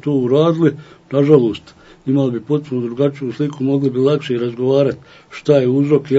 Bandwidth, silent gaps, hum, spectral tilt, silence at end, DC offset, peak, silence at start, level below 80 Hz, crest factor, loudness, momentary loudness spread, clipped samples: 8 kHz; none; none; -8.5 dB/octave; 0 s; under 0.1%; 0 dBFS; 0.05 s; -58 dBFS; 16 dB; -16 LUFS; 11 LU; under 0.1%